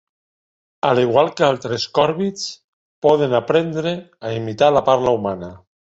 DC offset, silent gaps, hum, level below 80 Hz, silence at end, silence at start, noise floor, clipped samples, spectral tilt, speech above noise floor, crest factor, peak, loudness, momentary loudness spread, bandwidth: under 0.1%; 2.64-3.02 s; none; -56 dBFS; 0.4 s; 0.85 s; under -90 dBFS; under 0.1%; -5.5 dB/octave; over 72 dB; 18 dB; -2 dBFS; -18 LUFS; 12 LU; 8 kHz